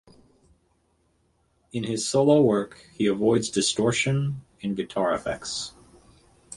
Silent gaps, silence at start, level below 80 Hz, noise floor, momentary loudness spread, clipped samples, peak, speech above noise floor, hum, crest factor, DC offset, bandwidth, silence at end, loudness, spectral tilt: none; 1.75 s; -58 dBFS; -68 dBFS; 13 LU; under 0.1%; -6 dBFS; 44 dB; none; 20 dB; under 0.1%; 11.5 kHz; 0 s; -24 LUFS; -5 dB/octave